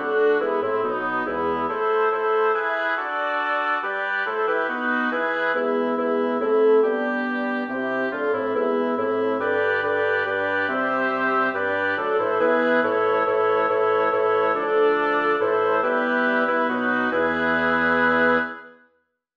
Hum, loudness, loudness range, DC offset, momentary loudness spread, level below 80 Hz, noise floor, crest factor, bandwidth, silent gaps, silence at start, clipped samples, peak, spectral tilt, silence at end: none; -22 LUFS; 2 LU; under 0.1%; 5 LU; -62 dBFS; -68 dBFS; 14 dB; 5.6 kHz; none; 0 s; under 0.1%; -8 dBFS; -6.5 dB/octave; 0.65 s